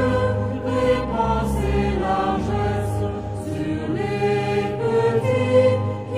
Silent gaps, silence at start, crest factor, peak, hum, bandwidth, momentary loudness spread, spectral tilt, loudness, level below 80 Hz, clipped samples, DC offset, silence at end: none; 0 s; 14 dB; -6 dBFS; none; 14 kHz; 7 LU; -7.5 dB/octave; -21 LUFS; -34 dBFS; under 0.1%; under 0.1%; 0 s